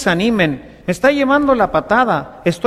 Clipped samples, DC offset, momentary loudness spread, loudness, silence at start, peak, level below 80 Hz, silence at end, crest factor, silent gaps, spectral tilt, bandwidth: under 0.1%; under 0.1%; 7 LU; -15 LUFS; 0 s; -2 dBFS; -42 dBFS; 0 s; 14 dB; none; -5.5 dB/octave; 14.5 kHz